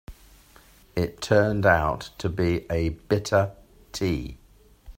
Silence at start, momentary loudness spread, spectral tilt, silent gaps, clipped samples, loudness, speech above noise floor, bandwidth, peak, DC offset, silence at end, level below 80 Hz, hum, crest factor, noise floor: 0.1 s; 11 LU; -6 dB/octave; none; under 0.1%; -25 LUFS; 30 dB; 16 kHz; -6 dBFS; under 0.1%; 0.05 s; -44 dBFS; none; 20 dB; -54 dBFS